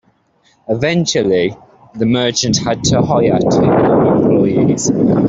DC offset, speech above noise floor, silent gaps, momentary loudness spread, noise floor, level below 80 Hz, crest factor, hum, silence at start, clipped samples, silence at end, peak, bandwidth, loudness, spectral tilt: under 0.1%; 43 dB; none; 5 LU; -56 dBFS; -42 dBFS; 12 dB; none; 0.7 s; under 0.1%; 0 s; 0 dBFS; 8 kHz; -13 LUFS; -5.5 dB/octave